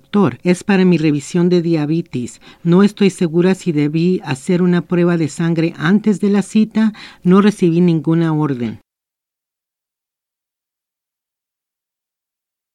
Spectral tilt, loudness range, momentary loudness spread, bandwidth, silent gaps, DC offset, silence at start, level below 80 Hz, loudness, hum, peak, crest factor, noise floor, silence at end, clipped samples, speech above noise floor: -7.5 dB/octave; 6 LU; 7 LU; 11.5 kHz; none; under 0.1%; 0.15 s; -58 dBFS; -15 LUFS; none; 0 dBFS; 16 dB; -85 dBFS; 4 s; under 0.1%; 71 dB